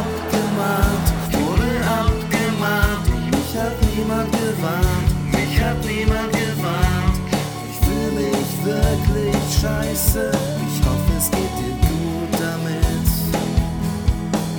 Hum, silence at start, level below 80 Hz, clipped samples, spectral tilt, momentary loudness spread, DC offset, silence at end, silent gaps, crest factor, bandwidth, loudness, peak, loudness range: none; 0 s; -26 dBFS; under 0.1%; -5.5 dB/octave; 3 LU; under 0.1%; 0 s; none; 16 dB; over 20 kHz; -20 LUFS; -2 dBFS; 1 LU